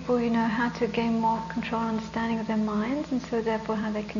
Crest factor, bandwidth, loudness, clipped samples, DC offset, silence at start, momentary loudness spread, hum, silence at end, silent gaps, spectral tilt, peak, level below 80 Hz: 14 dB; 7.4 kHz; -28 LUFS; under 0.1%; under 0.1%; 0 s; 4 LU; none; 0 s; none; -6.5 dB/octave; -14 dBFS; -52 dBFS